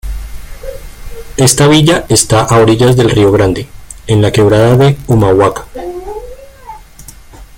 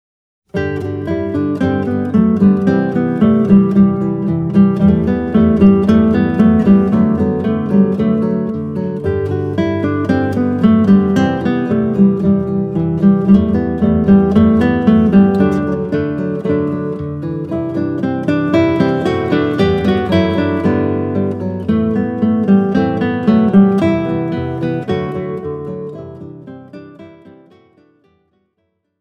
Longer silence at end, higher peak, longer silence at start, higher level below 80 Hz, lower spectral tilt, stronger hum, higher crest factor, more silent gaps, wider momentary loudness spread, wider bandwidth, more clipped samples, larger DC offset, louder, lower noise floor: second, 0.15 s vs 1.9 s; about the same, 0 dBFS vs 0 dBFS; second, 0.05 s vs 0.55 s; first, -28 dBFS vs -38 dBFS; second, -5 dB/octave vs -9.5 dB/octave; neither; about the same, 10 dB vs 14 dB; neither; first, 21 LU vs 10 LU; first, 17 kHz vs 6.2 kHz; neither; neither; first, -8 LUFS vs -14 LUFS; second, -34 dBFS vs -67 dBFS